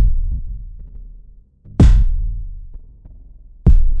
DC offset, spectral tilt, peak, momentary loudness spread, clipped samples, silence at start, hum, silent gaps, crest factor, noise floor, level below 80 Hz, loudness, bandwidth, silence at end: under 0.1%; -8.5 dB/octave; -2 dBFS; 25 LU; under 0.1%; 0 s; none; none; 12 dB; -42 dBFS; -16 dBFS; -18 LUFS; 6.6 kHz; 0 s